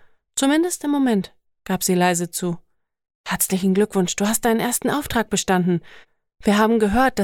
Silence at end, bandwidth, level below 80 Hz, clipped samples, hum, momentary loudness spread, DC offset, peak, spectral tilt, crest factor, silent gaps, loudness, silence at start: 0 s; 18.5 kHz; -46 dBFS; under 0.1%; none; 10 LU; under 0.1%; -6 dBFS; -4.5 dB/octave; 16 dB; 3.15-3.24 s; -20 LUFS; 0.35 s